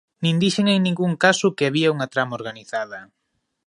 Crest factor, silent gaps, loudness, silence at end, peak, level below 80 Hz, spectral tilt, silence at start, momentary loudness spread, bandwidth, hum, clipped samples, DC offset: 20 dB; none; -20 LUFS; 0.6 s; -2 dBFS; -64 dBFS; -5 dB/octave; 0.2 s; 12 LU; 11.5 kHz; none; under 0.1%; under 0.1%